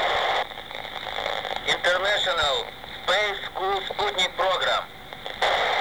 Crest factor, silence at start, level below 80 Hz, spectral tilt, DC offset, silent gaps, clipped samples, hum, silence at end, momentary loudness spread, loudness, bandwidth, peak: 18 dB; 0 s; -52 dBFS; -1.5 dB/octave; 0.3%; none; under 0.1%; none; 0 s; 12 LU; -24 LUFS; over 20 kHz; -8 dBFS